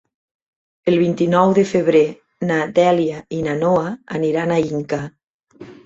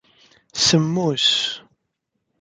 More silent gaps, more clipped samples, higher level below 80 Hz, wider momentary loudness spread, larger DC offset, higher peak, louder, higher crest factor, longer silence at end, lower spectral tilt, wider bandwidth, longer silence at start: first, 5.30-5.40 s vs none; neither; about the same, -56 dBFS vs -58 dBFS; second, 10 LU vs 14 LU; neither; about the same, -2 dBFS vs -4 dBFS; about the same, -18 LUFS vs -18 LUFS; about the same, 16 dB vs 18 dB; second, 0.1 s vs 0.8 s; first, -7 dB/octave vs -3.5 dB/octave; second, 8 kHz vs 9.6 kHz; first, 0.85 s vs 0.55 s